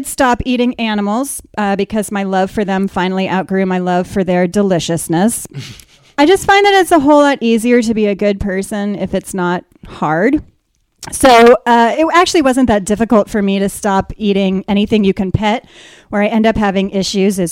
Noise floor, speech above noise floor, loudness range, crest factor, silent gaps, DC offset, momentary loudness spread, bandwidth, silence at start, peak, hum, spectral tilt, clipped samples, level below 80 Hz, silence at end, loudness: -60 dBFS; 47 dB; 5 LU; 12 dB; none; under 0.1%; 10 LU; 16.5 kHz; 0 s; 0 dBFS; none; -5 dB/octave; under 0.1%; -38 dBFS; 0 s; -13 LUFS